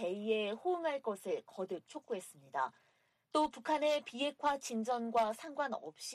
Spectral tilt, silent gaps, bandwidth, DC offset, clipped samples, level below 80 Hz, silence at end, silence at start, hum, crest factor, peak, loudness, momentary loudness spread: -3.5 dB/octave; none; 14 kHz; under 0.1%; under 0.1%; -78 dBFS; 0 s; 0 s; none; 18 dB; -20 dBFS; -37 LUFS; 9 LU